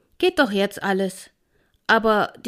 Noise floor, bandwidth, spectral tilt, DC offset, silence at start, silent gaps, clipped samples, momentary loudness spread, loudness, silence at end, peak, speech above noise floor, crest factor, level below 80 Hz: -65 dBFS; 15.5 kHz; -4.5 dB/octave; under 0.1%; 0.2 s; none; under 0.1%; 12 LU; -21 LUFS; 0 s; -4 dBFS; 44 dB; 18 dB; -54 dBFS